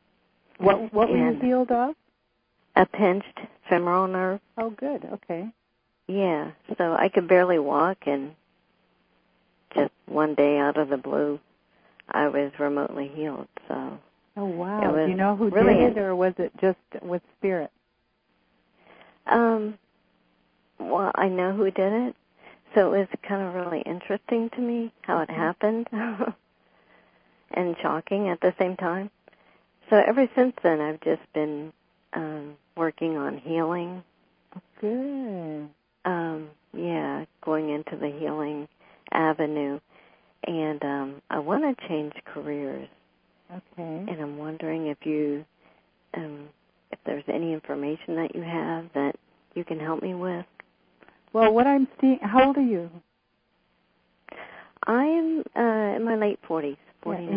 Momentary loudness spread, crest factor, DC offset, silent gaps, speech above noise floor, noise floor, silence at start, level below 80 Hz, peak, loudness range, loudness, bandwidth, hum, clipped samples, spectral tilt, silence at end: 16 LU; 24 dB; under 0.1%; none; 47 dB; -72 dBFS; 0.6 s; -62 dBFS; -2 dBFS; 9 LU; -26 LUFS; 5.2 kHz; none; under 0.1%; -11 dB/octave; 0 s